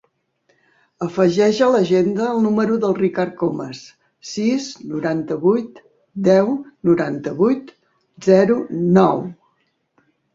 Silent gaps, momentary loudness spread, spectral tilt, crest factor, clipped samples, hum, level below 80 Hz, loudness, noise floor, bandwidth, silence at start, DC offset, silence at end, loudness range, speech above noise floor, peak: none; 14 LU; -7 dB/octave; 18 dB; under 0.1%; none; -60 dBFS; -18 LUFS; -66 dBFS; 7.8 kHz; 1 s; under 0.1%; 1 s; 3 LU; 49 dB; 0 dBFS